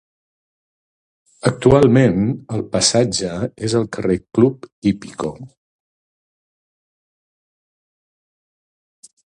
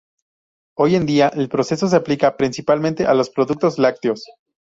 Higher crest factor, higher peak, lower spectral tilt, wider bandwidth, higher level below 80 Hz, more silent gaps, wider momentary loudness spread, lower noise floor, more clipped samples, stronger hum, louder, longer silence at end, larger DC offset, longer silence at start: about the same, 20 dB vs 18 dB; about the same, 0 dBFS vs -2 dBFS; about the same, -5.5 dB/octave vs -6 dB/octave; first, 11 kHz vs 7.8 kHz; first, -46 dBFS vs -56 dBFS; first, 4.72-4.82 s vs none; first, 12 LU vs 6 LU; about the same, under -90 dBFS vs under -90 dBFS; neither; neither; about the same, -17 LUFS vs -18 LUFS; first, 3.8 s vs 0.45 s; neither; first, 1.45 s vs 0.8 s